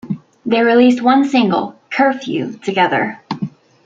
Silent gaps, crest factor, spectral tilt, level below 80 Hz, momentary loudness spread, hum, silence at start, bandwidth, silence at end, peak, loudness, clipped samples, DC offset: none; 14 dB; -6 dB/octave; -62 dBFS; 14 LU; none; 0.05 s; 7.6 kHz; 0.35 s; -2 dBFS; -15 LUFS; under 0.1%; under 0.1%